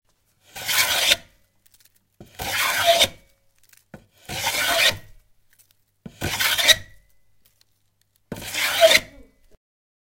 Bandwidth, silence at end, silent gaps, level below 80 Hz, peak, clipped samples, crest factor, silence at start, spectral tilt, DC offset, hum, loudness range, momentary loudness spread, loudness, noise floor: 17 kHz; 1 s; none; -52 dBFS; 0 dBFS; under 0.1%; 24 dB; 0.55 s; -0.5 dB/octave; under 0.1%; none; 4 LU; 17 LU; -19 LUFS; -68 dBFS